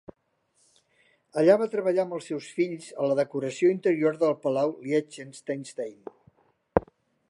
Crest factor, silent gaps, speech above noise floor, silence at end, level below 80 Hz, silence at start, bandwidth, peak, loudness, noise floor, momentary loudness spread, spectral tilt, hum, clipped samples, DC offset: 26 dB; none; 45 dB; 0.5 s; -56 dBFS; 1.35 s; 11.5 kHz; -2 dBFS; -27 LUFS; -71 dBFS; 14 LU; -6.5 dB/octave; none; under 0.1%; under 0.1%